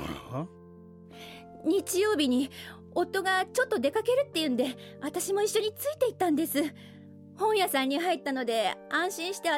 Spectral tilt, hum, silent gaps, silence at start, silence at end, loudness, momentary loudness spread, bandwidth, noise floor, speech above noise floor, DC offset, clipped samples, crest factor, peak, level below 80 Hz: -3.5 dB/octave; none; none; 0 s; 0 s; -29 LUFS; 12 LU; 17 kHz; -50 dBFS; 22 dB; under 0.1%; under 0.1%; 14 dB; -14 dBFS; -64 dBFS